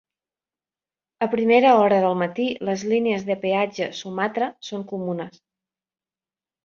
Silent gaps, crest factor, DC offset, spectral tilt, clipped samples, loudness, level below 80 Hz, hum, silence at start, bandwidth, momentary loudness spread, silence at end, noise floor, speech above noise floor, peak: none; 20 dB; under 0.1%; -5.5 dB/octave; under 0.1%; -22 LUFS; -68 dBFS; none; 1.2 s; 7.4 kHz; 14 LU; 1.35 s; under -90 dBFS; over 69 dB; -4 dBFS